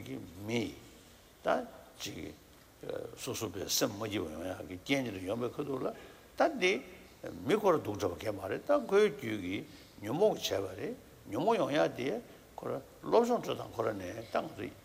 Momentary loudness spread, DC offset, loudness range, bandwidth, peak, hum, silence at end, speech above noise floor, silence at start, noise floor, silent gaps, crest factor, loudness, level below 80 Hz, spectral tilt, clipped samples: 16 LU; under 0.1%; 6 LU; 16 kHz; -14 dBFS; none; 0.05 s; 24 dB; 0 s; -58 dBFS; none; 20 dB; -34 LUFS; -66 dBFS; -4.5 dB/octave; under 0.1%